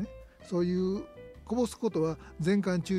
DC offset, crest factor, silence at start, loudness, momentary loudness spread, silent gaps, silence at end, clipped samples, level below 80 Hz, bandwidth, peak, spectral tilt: under 0.1%; 14 dB; 0 s; -31 LUFS; 15 LU; none; 0 s; under 0.1%; -54 dBFS; 14 kHz; -18 dBFS; -7 dB/octave